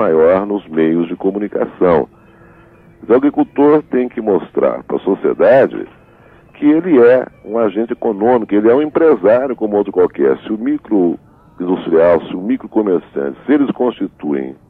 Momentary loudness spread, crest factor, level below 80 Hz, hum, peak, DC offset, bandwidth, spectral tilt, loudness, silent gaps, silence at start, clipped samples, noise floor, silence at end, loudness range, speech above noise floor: 9 LU; 12 dB; -50 dBFS; none; -2 dBFS; under 0.1%; 4.3 kHz; -9.5 dB/octave; -14 LUFS; none; 0 s; under 0.1%; -44 dBFS; 0.15 s; 3 LU; 31 dB